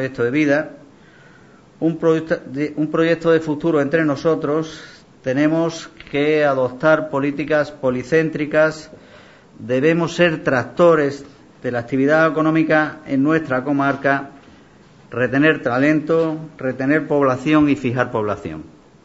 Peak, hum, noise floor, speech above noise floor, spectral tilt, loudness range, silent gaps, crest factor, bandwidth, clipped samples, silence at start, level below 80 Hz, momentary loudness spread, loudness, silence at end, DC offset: -2 dBFS; none; -47 dBFS; 29 dB; -7 dB/octave; 2 LU; none; 18 dB; 8 kHz; under 0.1%; 0 s; -54 dBFS; 10 LU; -18 LUFS; 0.35 s; under 0.1%